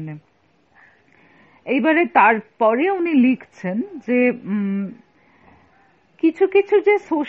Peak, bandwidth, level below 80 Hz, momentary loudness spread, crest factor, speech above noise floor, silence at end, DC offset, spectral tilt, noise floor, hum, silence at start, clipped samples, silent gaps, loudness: 0 dBFS; 6.8 kHz; -70 dBFS; 12 LU; 20 dB; 43 dB; 0 s; under 0.1%; -5 dB/octave; -60 dBFS; none; 0 s; under 0.1%; none; -18 LUFS